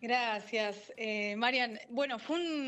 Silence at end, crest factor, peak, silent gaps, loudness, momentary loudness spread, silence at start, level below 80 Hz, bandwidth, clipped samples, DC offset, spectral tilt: 0 s; 18 dB; -16 dBFS; none; -34 LUFS; 6 LU; 0 s; -88 dBFS; 8.6 kHz; under 0.1%; under 0.1%; -3.5 dB/octave